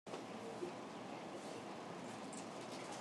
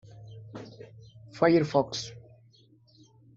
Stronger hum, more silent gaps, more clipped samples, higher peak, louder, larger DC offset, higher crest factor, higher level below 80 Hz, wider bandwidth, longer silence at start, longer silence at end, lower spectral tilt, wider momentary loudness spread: neither; neither; neither; second, -32 dBFS vs -8 dBFS; second, -49 LUFS vs -26 LUFS; neither; second, 16 dB vs 22 dB; second, -88 dBFS vs -66 dBFS; first, 13 kHz vs 7.8 kHz; second, 0.05 s vs 0.2 s; second, 0 s vs 1.2 s; second, -4 dB/octave vs -6 dB/octave; second, 2 LU vs 25 LU